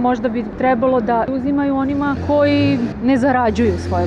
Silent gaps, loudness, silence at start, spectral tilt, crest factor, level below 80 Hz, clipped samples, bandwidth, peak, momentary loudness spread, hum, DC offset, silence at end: none; -17 LUFS; 0 s; -7.5 dB/octave; 10 dB; -38 dBFS; under 0.1%; 9 kHz; -6 dBFS; 4 LU; none; under 0.1%; 0 s